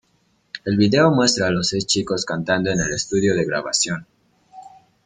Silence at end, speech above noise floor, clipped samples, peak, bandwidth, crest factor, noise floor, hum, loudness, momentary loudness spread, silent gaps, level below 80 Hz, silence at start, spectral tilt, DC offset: 0.35 s; 44 dB; under 0.1%; -2 dBFS; 9.6 kHz; 18 dB; -63 dBFS; none; -19 LUFS; 8 LU; none; -50 dBFS; 0.55 s; -4 dB/octave; under 0.1%